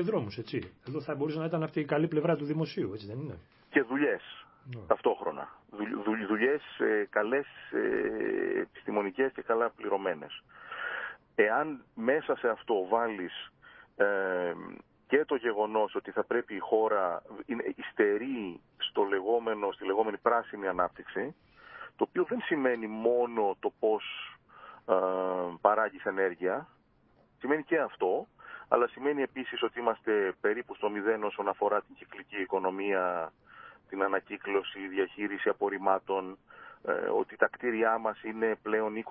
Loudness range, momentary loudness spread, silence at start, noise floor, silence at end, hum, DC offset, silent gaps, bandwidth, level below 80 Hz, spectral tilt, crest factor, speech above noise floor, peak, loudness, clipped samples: 2 LU; 12 LU; 0 s; -66 dBFS; 0 s; none; under 0.1%; none; 5.8 kHz; -70 dBFS; -9.5 dB/octave; 24 dB; 35 dB; -6 dBFS; -31 LUFS; under 0.1%